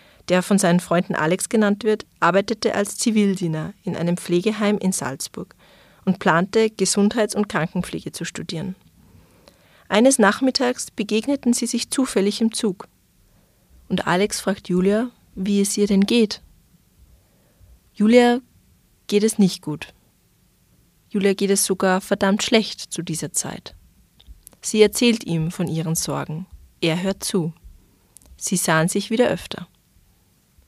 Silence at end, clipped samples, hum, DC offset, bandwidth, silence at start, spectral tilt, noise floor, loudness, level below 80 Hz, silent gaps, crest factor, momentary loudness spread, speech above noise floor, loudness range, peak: 1.05 s; under 0.1%; none; under 0.1%; 15 kHz; 0.3 s; -4.5 dB/octave; -60 dBFS; -21 LUFS; -54 dBFS; none; 20 dB; 12 LU; 40 dB; 3 LU; -2 dBFS